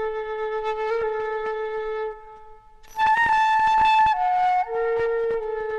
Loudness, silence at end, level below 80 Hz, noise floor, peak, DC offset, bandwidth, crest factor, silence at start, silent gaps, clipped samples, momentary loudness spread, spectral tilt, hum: -22 LUFS; 0 s; -50 dBFS; -45 dBFS; -10 dBFS; under 0.1%; 12 kHz; 12 dB; 0 s; none; under 0.1%; 11 LU; -3 dB/octave; 50 Hz at -65 dBFS